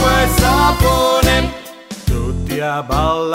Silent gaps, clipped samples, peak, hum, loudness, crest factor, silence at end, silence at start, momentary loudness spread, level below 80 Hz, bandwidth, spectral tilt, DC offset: none; under 0.1%; 0 dBFS; none; -15 LUFS; 14 dB; 0 s; 0 s; 11 LU; -22 dBFS; 16.5 kHz; -4.5 dB/octave; under 0.1%